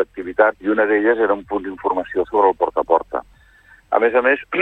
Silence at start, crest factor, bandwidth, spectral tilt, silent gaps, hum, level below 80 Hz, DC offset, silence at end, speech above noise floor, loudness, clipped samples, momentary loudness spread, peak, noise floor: 0 s; 16 dB; 4.1 kHz; -7 dB/octave; none; none; -52 dBFS; under 0.1%; 0 s; 32 dB; -18 LUFS; under 0.1%; 7 LU; -2 dBFS; -50 dBFS